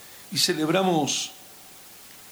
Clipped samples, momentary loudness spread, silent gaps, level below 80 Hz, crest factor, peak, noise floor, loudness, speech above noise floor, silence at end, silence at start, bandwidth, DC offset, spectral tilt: under 0.1%; 22 LU; none; -70 dBFS; 18 dB; -10 dBFS; -47 dBFS; -24 LUFS; 23 dB; 0 s; 0 s; over 20 kHz; under 0.1%; -3 dB/octave